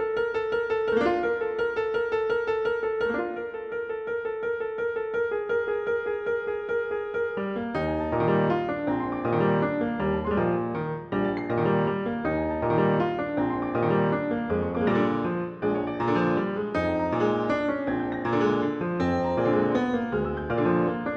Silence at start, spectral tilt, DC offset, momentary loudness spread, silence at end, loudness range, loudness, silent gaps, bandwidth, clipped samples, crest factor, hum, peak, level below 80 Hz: 0 s; -8.5 dB/octave; under 0.1%; 6 LU; 0 s; 3 LU; -26 LUFS; none; 6.8 kHz; under 0.1%; 16 dB; none; -10 dBFS; -50 dBFS